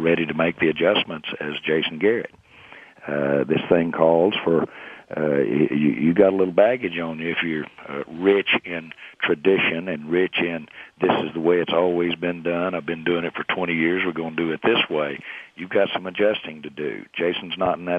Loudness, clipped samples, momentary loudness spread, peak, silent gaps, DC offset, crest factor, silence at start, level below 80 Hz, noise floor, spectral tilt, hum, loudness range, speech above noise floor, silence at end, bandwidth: -22 LUFS; under 0.1%; 12 LU; -2 dBFS; none; under 0.1%; 20 dB; 0 s; -60 dBFS; -46 dBFS; -8 dB/octave; none; 3 LU; 24 dB; 0 s; 5 kHz